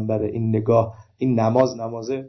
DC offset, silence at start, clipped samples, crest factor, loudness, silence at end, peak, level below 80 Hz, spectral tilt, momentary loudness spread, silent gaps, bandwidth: under 0.1%; 0 s; under 0.1%; 16 dB; -21 LUFS; 0 s; -6 dBFS; -52 dBFS; -8 dB/octave; 9 LU; none; 6.2 kHz